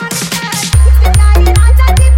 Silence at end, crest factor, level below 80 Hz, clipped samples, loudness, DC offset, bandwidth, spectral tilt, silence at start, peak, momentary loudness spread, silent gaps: 0 s; 6 dB; -8 dBFS; under 0.1%; -9 LUFS; under 0.1%; 16 kHz; -4.5 dB/octave; 0 s; 0 dBFS; 7 LU; none